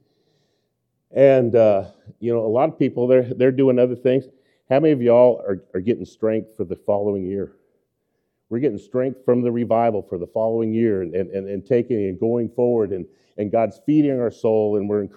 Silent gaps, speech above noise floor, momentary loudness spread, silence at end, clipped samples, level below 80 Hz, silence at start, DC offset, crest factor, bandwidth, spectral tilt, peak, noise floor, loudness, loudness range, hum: none; 54 dB; 12 LU; 0.1 s; under 0.1%; -64 dBFS; 1.15 s; under 0.1%; 18 dB; 6.8 kHz; -9.5 dB/octave; -2 dBFS; -73 dBFS; -20 LUFS; 6 LU; none